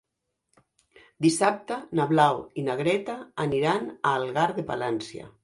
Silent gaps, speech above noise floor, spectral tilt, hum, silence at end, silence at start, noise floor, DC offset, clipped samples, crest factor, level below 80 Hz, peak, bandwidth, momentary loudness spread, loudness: none; 56 dB; -5 dB/octave; none; 0.15 s; 1.2 s; -81 dBFS; under 0.1%; under 0.1%; 22 dB; -64 dBFS; -6 dBFS; 11.5 kHz; 9 LU; -26 LUFS